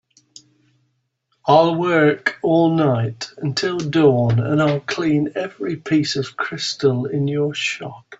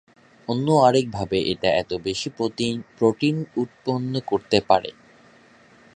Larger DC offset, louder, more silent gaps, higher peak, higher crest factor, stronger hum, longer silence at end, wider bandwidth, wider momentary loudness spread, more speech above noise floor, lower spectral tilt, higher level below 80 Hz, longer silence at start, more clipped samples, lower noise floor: neither; first, -19 LUFS vs -22 LUFS; neither; about the same, -2 dBFS vs -2 dBFS; second, 16 dB vs 22 dB; neither; second, 0.05 s vs 1.05 s; second, 8 kHz vs 11 kHz; about the same, 10 LU vs 10 LU; first, 51 dB vs 31 dB; about the same, -6 dB/octave vs -5.5 dB/octave; about the same, -58 dBFS vs -54 dBFS; first, 1.45 s vs 0.5 s; neither; first, -69 dBFS vs -53 dBFS